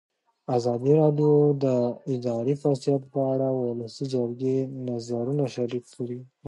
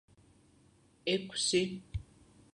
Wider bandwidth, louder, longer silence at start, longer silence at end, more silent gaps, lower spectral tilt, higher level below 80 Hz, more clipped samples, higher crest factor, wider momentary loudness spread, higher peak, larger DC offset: about the same, 11 kHz vs 11 kHz; first, -26 LUFS vs -34 LUFS; second, 0.5 s vs 1.05 s; second, 0 s vs 0.5 s; neither; first, -8.5 dB/octave vs -3.5 dB/octave; second, -72 dBFS vs -54 dBFS; neither; second, 16 dB vs 22 dB; second, 12 LU vs 15 LU; first, -8 dBFS vs -16 dBFS; neither